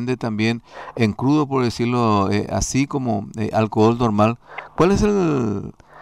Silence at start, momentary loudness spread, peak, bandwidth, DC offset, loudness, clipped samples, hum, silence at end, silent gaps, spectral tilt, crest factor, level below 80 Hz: 0 s; 10 LU; -6 dBFS; 13 kHz; 0.1%; -20 LUFS; under 0.1%; none; 0 s; none; -6 dB/octave; 14 dB; -40 dBFS